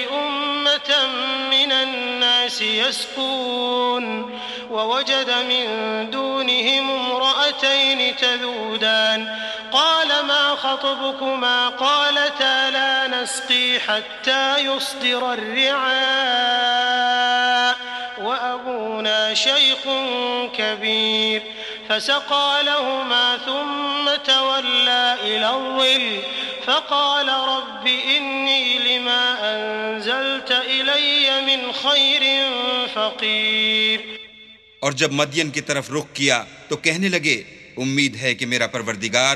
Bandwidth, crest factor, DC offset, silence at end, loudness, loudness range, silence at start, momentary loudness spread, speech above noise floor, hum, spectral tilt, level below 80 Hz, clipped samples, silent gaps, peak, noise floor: 13.5 kHz; 20 dB; under 0.1%; 0 s; -18 LUFS; 3 LU; 0 s; 8 LU; 26 dB; none; -2 dB/octave; -68 dBFS; under 0.1%; none; 0 dBFS; -46 dBFS